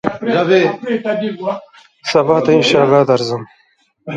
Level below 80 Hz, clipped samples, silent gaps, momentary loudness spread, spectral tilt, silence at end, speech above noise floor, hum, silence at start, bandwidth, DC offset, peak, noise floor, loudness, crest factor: -56 dBFS; under 0.1%; none; 14 LU; -5.5 dB/octave; 0 s; 25 dB; none; 0.05 s; 9.4 kHz; under 0.1%; 0 dBFS; -38 dBFS; -14 LUFS; 14 dB